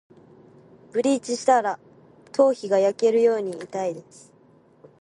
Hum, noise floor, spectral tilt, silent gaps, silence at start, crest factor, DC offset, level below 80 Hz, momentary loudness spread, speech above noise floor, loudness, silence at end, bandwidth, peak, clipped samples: none; -56 dBFS; -4.5 dB/octave; none; 0.95 s; 18 dB; under 0.1%; -74 dBFS; 11 LU; 34 dB; -23 LUFS; 1 s; 11 kHz; -6 dBFS; under 0.1%